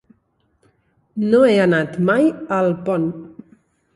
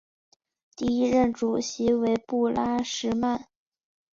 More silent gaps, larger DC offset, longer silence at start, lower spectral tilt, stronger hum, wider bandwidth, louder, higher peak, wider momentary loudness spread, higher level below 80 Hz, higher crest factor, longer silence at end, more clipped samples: neither; neither; first, 1.15 s vs 0.8 s; first, -7.5 dB/octave vs -5 dB/octave; neither; first, 11.5 kHz vs 7.6 kHz; first, -17 LUFS vs -26 LUFS; first, -4 dBFS vs -10 dBFS; first, 12 LU vs 5 LU; about the same, -60 dBFS vs -56 dBFS; about the same, 16 dB vs 16 dB; about the same, 0.7 s vs 0.7 s; neither